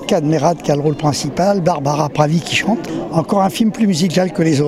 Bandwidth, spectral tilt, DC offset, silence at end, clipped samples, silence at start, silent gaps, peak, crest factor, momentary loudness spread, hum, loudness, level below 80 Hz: 14.5 kHz; -5.5 dB/octave; under 0.1%; 0 s; under 0.1%; 0 s; none; 0 dBFS; 16 dB; 3 LU; none; -16 LUFS; -48 dBFS